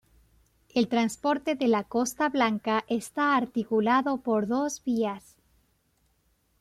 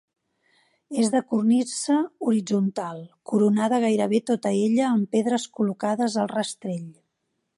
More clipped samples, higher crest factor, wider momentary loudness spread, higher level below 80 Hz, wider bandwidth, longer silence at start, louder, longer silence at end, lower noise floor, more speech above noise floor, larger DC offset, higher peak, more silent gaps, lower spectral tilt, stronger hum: neither; about the same, 16 dB vs 14 dB; second, 5 LU vs 11 LU; first, -66 dBFS vs -76 dBFS; first, 14.5 kHz vs 11.5 kHz; second, 0.75 s vs 0.9 s; second, -27 LUFS vs -24 LUFS; first, 1.4 s vs 0.65 s; second, -70 dBFS vs -77 dBFS; second, 44 dB vs 54 dB; neither; about the same, -12 dBFS vs -10 dBFS; neither; about the same, -4.5 dB/octave vs -5.5 dB/octave; neither